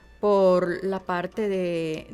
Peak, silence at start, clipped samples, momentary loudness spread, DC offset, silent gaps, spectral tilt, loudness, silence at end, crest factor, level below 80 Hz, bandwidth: -10 dBFS; 0.2 s; under 0.1%; 9 LU; under 0.1%; none; -7 dB/octave; -24 LUFS; 0 s; 14 dB; -56 dBFS; 12 kHz